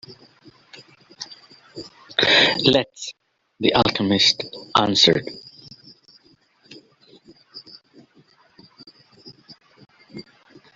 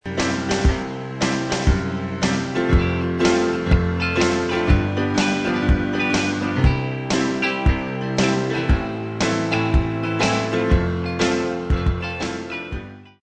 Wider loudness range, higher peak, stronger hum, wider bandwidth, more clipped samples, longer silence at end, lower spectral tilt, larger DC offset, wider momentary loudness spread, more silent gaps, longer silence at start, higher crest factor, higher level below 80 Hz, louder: first, 5 LU vs 2 LU; about the same, -2 dBFS vs -2 dBFS; neither; second, 8.2 kHz vs 9.4 kHz; neither; first, 0.55 s vs 0.15 s; second, -3.5 dB/octave vs -5.5 dB/octave; neither; first, 27 LU vs 6 LU; neither; about the same, 0.1 s vs 0.05 s; about the same, 22 dB vs 18 dB; second, -56 dBFS vs -26 dBFS; first, -17 LUFS vs -21 LUFS